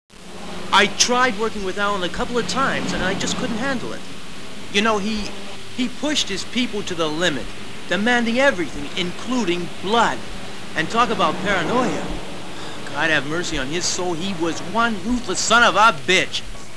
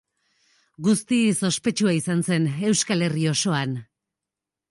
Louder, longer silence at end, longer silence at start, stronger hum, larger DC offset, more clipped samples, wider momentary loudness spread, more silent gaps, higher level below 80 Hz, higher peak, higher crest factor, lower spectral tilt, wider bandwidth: about the same, -20 LUFS vs -22 LUFS; second, 0 s vs 0.9 s; second, 0.1 s vs 0.8 s; neither; first, 4% vs under 0.1%; neither; first, 16 LU vs 5 LU; neither; first, -44 dBFS vs -66 dBFS; first, -2 dBFS vs -10 dBFS; first, 20 dB vs 14 dB; second, -3 dB/octave vs -4.5 dB/octave; about the same, 11 kHz vs 11.5 kHz